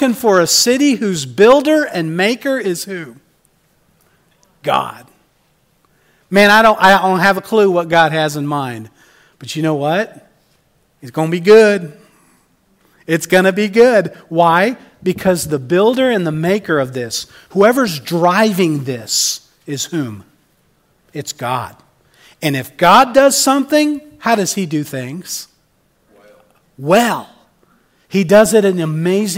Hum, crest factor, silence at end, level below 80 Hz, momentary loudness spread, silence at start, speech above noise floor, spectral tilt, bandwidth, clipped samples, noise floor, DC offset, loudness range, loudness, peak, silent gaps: none; 14 dB; 0 s; -54 dBFS; 16 LU; 0 s; 45 dB; -4 dB/octave; 16.5 kHz; under 0.1%; -58 dBFS; under 0.1%; 9 LU; -13 LUFS; 0 dBFS; none